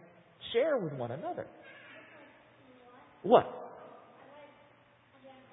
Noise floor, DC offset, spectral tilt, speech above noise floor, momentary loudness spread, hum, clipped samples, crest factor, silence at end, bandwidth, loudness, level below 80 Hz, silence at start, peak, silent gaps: -63 dBFS; under 0.1%; -3 dB/octave; 33 dB; 28 LU; none; under 0.1%; 28 dB; 0.2 s; 3.8 kHz; -31 LUFS; -76 dBFS; 0.4 s; -8 dBFS; none